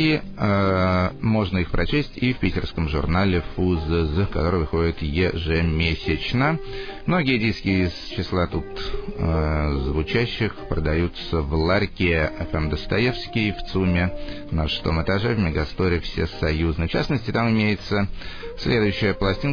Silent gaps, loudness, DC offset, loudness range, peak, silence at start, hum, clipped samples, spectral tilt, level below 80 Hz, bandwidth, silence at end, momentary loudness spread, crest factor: none; -23 LUFS; under 0.1%; 1 LU; -4 dBFS; 0 s; none; under 0.1%; -7.5 dB/octave; -32 dBFS; 5.4 kHz; 0 s; 6 LU; 18 dB